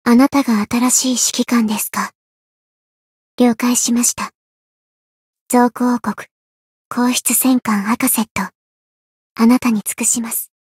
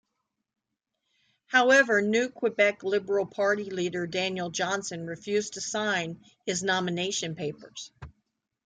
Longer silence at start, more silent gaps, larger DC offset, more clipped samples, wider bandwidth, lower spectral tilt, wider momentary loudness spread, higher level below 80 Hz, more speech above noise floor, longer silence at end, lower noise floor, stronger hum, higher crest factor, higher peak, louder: second, 0.05 s vs 1.5 s; first, 2.15-3.38 s, 4.35-5.34 s, 5.41-5.46 s, 6.31-6.91 s, 8.31-8.35 s, 8.55-9.36 s vs none; neither; neither; first, 16.5 kHz vs 9.6 kHz; about the same, -3 dB/octave vs -3.5 dB/octave; second, 11 LU vs 15 LU; first, -58 dBFS vs -66 dBFS; first, over 75 dB vs 57 dB; second, 0.15 s vs 0.55 s; first, under -90 dBFS vs -84 dBFS; neither; about the same, 16 dB vs 20 dB; first, -2 dBFS vs -8 dBFS; first, -15 LUFS vs -27 LUFS